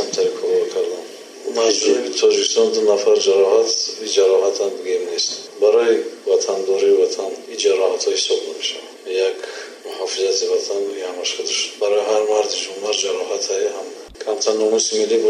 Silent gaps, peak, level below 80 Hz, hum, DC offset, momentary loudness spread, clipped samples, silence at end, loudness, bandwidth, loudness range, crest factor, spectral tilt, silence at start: none; -2 dBFS; -66 dBFS; none; under 0.1%; 11 LU; under 0.1%; 0 s; -18 LUFS; 11 kHz; 5 LU; 16 dB; -1 dB/octave; 0 s